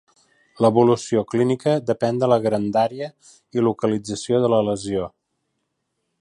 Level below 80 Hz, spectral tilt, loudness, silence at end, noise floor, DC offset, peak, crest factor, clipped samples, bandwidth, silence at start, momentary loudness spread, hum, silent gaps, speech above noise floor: -58 dBFS; -6.5 dB/octave; -20 LUFS; 1.15 s; -75 dBFS; under 0.1%; -4 dBFS; 18 dB; under 0.1%; 11.5 kHz; 0.6 s; 9 LU; none; none; 55 dB